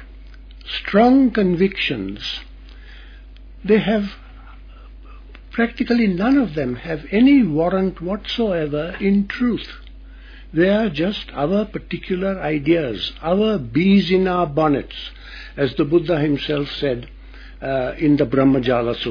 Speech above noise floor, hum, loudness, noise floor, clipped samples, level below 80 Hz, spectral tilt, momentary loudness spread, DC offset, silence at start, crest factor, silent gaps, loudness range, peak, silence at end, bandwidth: 21 dB; none; -19 LUFS; -39 dBFS; under 0.1%; -40 dBFS; -8 dB/octave; 13 LU; under 0.1%; 0 s; 16 dB; none; 4 LU; -2 dBFS; 0 s; 5.4 kHz